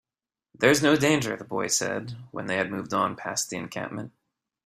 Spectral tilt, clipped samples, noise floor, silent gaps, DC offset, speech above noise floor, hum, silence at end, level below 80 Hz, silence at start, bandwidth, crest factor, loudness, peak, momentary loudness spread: -3.5 dB/octave; under 0.1%; under -90 dBFS; none; under 0.1%; over 64 dB; none; 0.55 s; -64 dBFS; 0.6 s; 16 kHz; 22 dB; -26 LUFS; -6 dBFS; 15 LU